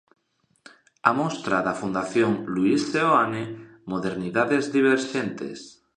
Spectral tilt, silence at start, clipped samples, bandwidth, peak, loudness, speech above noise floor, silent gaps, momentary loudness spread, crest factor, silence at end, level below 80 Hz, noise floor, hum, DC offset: -5.5 dB/octave; 1.05 s; under 0.1%; 10 kHz; -2 dBFS; -24 LUFS; 46 dB; none; 12 LU; 24 dB; 0.25 s; -64 dBFS; -69 dBFS; none; under 0.1%